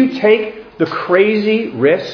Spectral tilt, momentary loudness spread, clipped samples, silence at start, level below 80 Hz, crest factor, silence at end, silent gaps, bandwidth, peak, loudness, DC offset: -7 dB/octave; 8 LU; under 0.1%; 0 s; -56 dBFS; 14 dB; 0 s; none; 5.4 kHz; 0 dBFS; -14 LUFS; under 0.1%